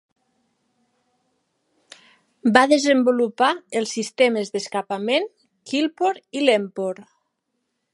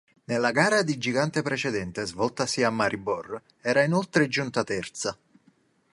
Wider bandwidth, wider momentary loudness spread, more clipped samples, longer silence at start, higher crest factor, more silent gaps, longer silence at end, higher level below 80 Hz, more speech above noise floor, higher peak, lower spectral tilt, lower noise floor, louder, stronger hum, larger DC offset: about the same, 11.5 kHz vs 11.5 kHz; about the same, 11 LU vs 10 LU; neither; first, 2.45 s vs 0.3 s; about the same, 22 dB vs 22 dB; neither; about the same, 0.9 s vs 0.8 s; second, -70 dBFS vs -62 dBFS; first, 55 dB vs 38 dB; first, 0 dBFS vs -6 dBFS; about the same, -3.5 dB/octave vs -4.5 dB/octave; first, -76 dBFS vs -64 dBFS; first, -21 LUFS vs -26 LUFS; neither; neither